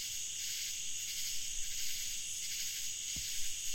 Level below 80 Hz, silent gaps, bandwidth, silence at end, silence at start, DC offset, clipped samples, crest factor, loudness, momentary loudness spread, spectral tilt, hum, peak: -56 dBFS; none; 16.5 kHz; 0 s; 0 s; 0.2%; under 0.1%; 14 dB; -37 LUFS; 1 LU; 2 dB/octave; none; -24 dBFS